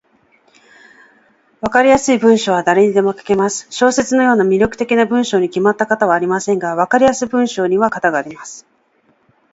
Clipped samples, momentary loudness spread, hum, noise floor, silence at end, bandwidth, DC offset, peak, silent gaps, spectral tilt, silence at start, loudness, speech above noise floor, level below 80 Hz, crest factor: under 0.1%; 6 LU; none; -58 dBFS; 0.9 s; 8 kHz; under 0.1%; 0 dBFS; none; -4.5 dB/octave; 1.65 s; -14 LUFS; 44 dB; -50 dBFS; 16 dB